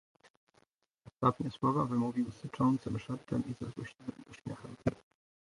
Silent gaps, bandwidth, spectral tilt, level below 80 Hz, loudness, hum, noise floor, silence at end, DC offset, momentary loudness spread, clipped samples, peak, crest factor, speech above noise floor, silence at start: none; 11.5 kHz; -8 dB/octave; -62 dBFS; -35 LUFS; none; -73 dBFS; 0.5 s; under 0.1%; 14 LU; under 0.1%; -14 dBFS; 22 dB; 38 dB; 1.05 s